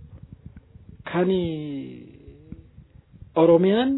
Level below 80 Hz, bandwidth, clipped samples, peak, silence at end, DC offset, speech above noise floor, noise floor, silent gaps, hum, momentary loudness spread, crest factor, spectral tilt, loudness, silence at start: -52 dBFS; 4.1 kHz; under 0.1%; -6 dBFS; 0 s; under 0.1%; 30 dB; -50 dBFS; none; none; 28 LU; 18 dB; -11 dB/octave; -22 LUFS; 0 s